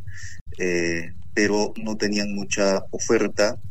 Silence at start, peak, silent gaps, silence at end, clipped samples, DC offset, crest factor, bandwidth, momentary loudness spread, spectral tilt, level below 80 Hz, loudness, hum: 0 s; -8 dBFS; 0.41-0.46 s; 0 s; under 0.1%; 3%; 16 dB; 15.5 kHz; 8 LU; -4 dB/octave; -48 dBFS; -24 LUFS; none